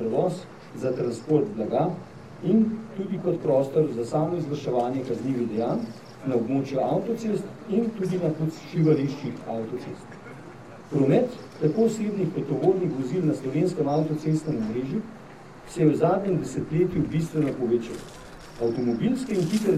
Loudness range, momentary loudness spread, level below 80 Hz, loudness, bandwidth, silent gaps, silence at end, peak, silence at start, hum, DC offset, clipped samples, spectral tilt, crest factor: 2 LU; 15 LU; -58 dBFS; -26 LUFS; 13.5 kHz; none; 0 s; -8 dBFS; 0 s; none; 0.2%; under 0.1%; -8 dB/octave; 18 dB